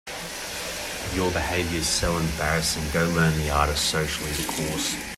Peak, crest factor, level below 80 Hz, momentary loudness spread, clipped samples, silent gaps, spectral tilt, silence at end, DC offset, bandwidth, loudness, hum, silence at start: -8 dBFS; 18 dB; -38 dBFS; 8 LU; under 0.1%; none; -3.5 dB/octave; 0 s; under 0.1%; 16 kHz; -25 LUFS; none; 0.05 s